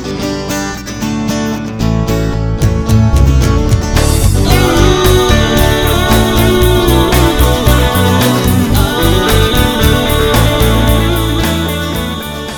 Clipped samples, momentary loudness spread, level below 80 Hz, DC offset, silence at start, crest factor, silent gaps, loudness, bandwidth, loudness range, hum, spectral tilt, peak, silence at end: 0.2%; 8 LU; -16 dBFS; under 0.1%; 0 s; 10 dB; none; -11 LUFS; over 20 kHz; 3 LU; none; -5 dB/octave; 0 dBFS; 0 s